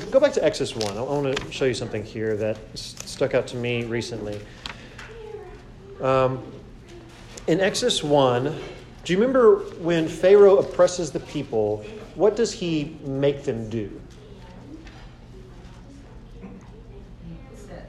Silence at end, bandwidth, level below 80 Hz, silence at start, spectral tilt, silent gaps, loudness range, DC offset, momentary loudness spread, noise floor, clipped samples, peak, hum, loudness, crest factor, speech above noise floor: 0 s; 12.5 kHz; -48 dBFS; 0 s; -5 dB/octave; none; 16 LU; under 0.1%; 24 LU; -43 dBFS; under 0.1%; -4 dBFS; none; -22 LUFS; 18 dB; 21 dB